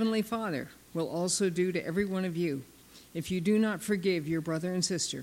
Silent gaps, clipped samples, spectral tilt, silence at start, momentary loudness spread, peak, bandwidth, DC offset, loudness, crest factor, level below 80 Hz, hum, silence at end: none; under 0.1%; -4.5 dB/octave; 0 s; 9 LU; -16 dBFS; 16.5 kHz; under 0.1%; -31 LUFS; 16 dB; -64 dBFS; none; 0 s